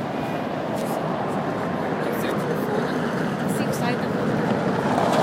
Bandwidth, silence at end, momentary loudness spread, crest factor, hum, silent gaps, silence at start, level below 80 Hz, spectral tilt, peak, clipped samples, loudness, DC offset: 16 kHz; 0 s; 4 LU; 16 dB; none; none; 0 s; -56 dBFS; -6 dB/octave; -6 dBFS; under 0.1%; -24 LUFS; under 0.1%